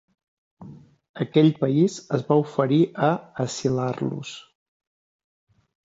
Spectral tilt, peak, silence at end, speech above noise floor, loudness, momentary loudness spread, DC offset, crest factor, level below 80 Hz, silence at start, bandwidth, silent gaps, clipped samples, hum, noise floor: -7 dB/octave; -6 dBFS; 1.45 s; 23 dB; -23 LUFS; 12 LU; under 0.1%; 18 dB; -66 dBFS; 0.6 s; 8 kHz; 1.09-1.14 s; under 0.1%; none; -45 dBFS